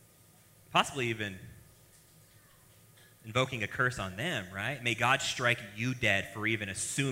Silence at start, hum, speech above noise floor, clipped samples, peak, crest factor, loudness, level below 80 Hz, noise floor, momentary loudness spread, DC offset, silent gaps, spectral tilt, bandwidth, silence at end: 0.7 s; none; 29 dB; under 0.1%; -10 dBFS; 24 dB; -31 LUFS; -62 dBFS; -61 dBFS; 8 LU; under 0.1%; none; -3.5 dB/octave; 16 kHz; 0 s